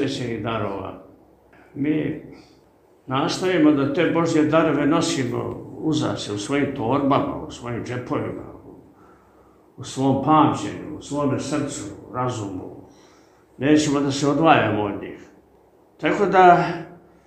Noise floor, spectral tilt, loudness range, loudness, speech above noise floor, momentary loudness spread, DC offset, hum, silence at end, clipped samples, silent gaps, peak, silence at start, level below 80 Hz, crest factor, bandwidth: -55 dBFS; -5.5 dB/octave; 7 LU; -21 LUFS; 35 dB; 16 LU; under 0.1%; none; 0.3 s; under 0.1%; none; 0 dBFS; 0 s; -54 dBFS; 22 dB; 9.4 kHz